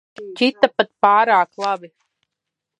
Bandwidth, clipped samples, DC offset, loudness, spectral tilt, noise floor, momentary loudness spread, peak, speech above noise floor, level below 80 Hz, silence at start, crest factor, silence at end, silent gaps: 10.5 kHz; under 0.1%; under 0.1%; -17 LUFS; -4 dB/octave; -82 dBFS; 11 LU; 0 dBFS; 65 dB; -66 dBFS; 0.2 s; 20 dB; 0.95 s; none